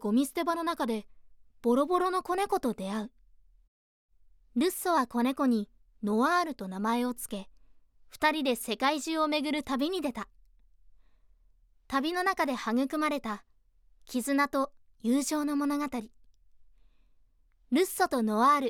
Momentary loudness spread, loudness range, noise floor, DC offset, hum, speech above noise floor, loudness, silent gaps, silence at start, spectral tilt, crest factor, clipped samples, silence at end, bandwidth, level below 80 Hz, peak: 10 LU; 3 LU; -64 dBFS; under 0.1%; none; 35 dB; -30 LUFS; 3.68-4.09 s; 0 s; -4 dB/octave; 18 dB; under 0.1%; 0 s; 18.5 kHz; -64 dBFS; -14 dBFS